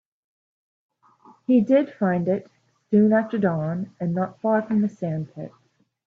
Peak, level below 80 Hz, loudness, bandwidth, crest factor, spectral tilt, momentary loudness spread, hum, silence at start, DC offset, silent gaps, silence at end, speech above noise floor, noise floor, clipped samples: -8 dBFS; -68 dBFS; -23 LUFS; 4.2 kHz; 16 dB; -10 dB/octave; 13 LU; none; 1.5 s; under 0.1%; none; 0.6 s; 33 dB; -54 dBFS; under 0.1%